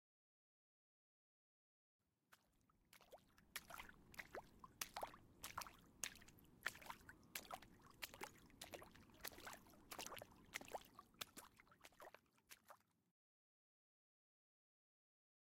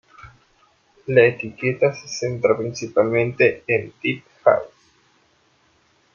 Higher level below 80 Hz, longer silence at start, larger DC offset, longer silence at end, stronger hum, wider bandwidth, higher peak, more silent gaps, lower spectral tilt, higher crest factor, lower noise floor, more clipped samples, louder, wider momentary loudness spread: second, -78 dBFS vs -60 dBFS; first, 2.3 s vs 0.25 s; neither; first, 2.65 s vs 1.5 s; neither; first, 16.5 kHz vs 7.2 kHz; second, -26 dBFS vs -2 dBFS; neither; second, -1.5 dB/octave vs -5.5 dB/octave; first, 34 dB vs 20 dB; first, -81 dBFS vs -61 dBFS; neither; second, -56 LUFS vs -20 LUFS; first, 15 LU vs 10 LU